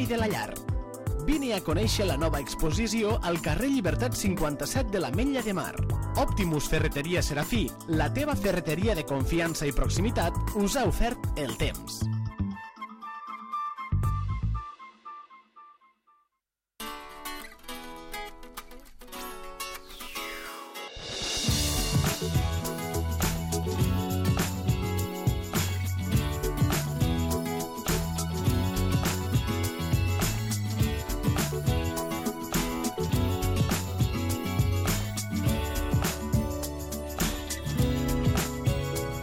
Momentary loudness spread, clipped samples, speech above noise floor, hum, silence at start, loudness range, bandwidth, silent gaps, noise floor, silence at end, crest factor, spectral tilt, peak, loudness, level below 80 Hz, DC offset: 12 LU; under 0.1%; 58 dB; none; 0 s; 11 LU; 17 kHz; none; -85 dBFS; 0 s; 16 dB; -5 dB/octave; -12 dBFS; -29 LUFS; -36 dBFS; under 0.1%